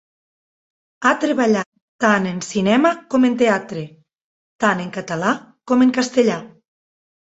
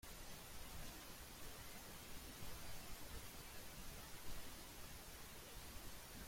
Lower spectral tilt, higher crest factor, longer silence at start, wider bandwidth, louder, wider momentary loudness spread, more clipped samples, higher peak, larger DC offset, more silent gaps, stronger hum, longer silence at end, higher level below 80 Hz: first, -5 dB/octave vs -2.5 dB/octave; about the same, 18 dB vs 16 dB; first, 1 s vs 0.05 s; second, 8 kHz vs 16.5 kHz; first, -18 LUFS vs -55 LUFS; first, 11 LU vs 1 LU; neither; first, -2 dBFS vs -36 dBFS; neither; first, 1.66-1.72 s, 1.82-1.99 s, 4.21-4.59 s vs none; neither; first, 0.8 s vs 0 s; about the same, -62 dBFS vs -60 dBFS